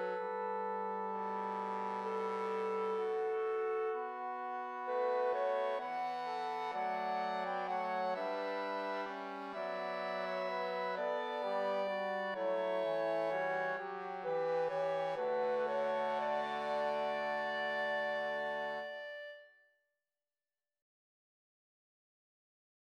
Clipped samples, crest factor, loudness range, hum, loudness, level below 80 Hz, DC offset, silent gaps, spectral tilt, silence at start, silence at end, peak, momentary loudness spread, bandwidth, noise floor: under 0.1%; 14 dB; 3 LU; none; -38 LUFS; under -90 dBFS; under 0.1%; none; -5 dB/octave; 0 s; 3.35 s; -24 dBFS; 6 LU; 10 kHz; under -90 dBFS